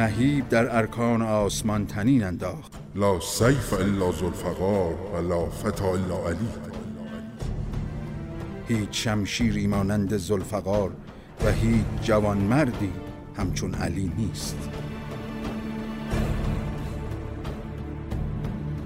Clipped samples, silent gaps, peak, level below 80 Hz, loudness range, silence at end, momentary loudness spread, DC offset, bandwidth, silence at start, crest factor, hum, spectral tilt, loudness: under 0.1%; none; -8 dBFS; -38 dBFS; 7 LU; 0 s; 12 LU; under 0.1%; 16 kHz; 0 s; 18 dB; none; -6 dB/octave; -27 LUFS